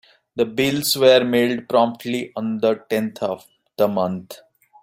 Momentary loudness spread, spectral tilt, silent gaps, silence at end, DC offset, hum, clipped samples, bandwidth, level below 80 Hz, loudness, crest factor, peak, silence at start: 13 LU; -4.5 dB/octave; none; 0.45 s; under 0.1%; none; under 0.1%; 16 kHz; -62 dBFS; -20 LUFS; 18 dB; -2 dBFS; 0.35 s